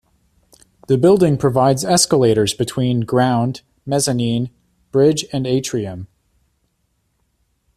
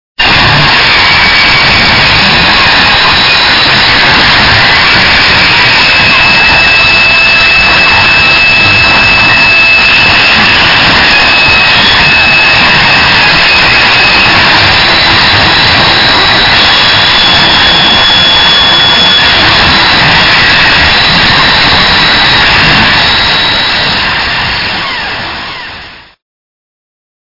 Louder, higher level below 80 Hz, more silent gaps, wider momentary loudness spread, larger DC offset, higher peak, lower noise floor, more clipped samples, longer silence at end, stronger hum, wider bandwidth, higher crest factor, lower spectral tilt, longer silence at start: second, -17 LUFS vs -2 LUFS; second, -50 dBFS vs -26 dBFS; neither; first, 10 LU vs 3 LU; neither; about the same, -2 dBFS vs 0 dBFS; first, -67 dBFS vs -27 dBFS; second, under 0.1% vs 5%; first, 1.7 s vs 1.25 s; neither; first, 14.5 kHz vs 6 kHz; first, 16 dB vs 6 dB; first, -5 dB/octave vs -3 dB/octave; first, 0.9 s vs 0.2 s